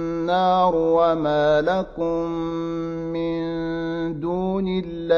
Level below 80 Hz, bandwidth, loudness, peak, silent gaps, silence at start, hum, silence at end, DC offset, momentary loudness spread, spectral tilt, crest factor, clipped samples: -46 dBFS; 7 kHz; -22 LUFS; -6 dBFS; none; 0 s; none; 0 s; under 0.1%; 8 LU; -7.5 dB/octave; 16 dB; under 0.1%